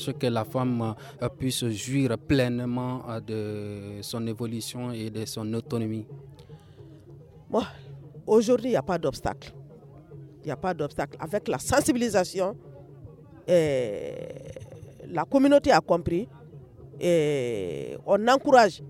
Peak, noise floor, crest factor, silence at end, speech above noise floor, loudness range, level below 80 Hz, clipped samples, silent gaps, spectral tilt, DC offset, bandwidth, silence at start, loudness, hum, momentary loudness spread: -4 dBFS; -49 dBFS; 22 dB; 0 s; 23 dB; 8 LU; -54 dBFS; under 0.1%; none; -5.5 dB/octave; under 0.1%; 16 kHz; 0 s; -26 LUFS; none; 21 LU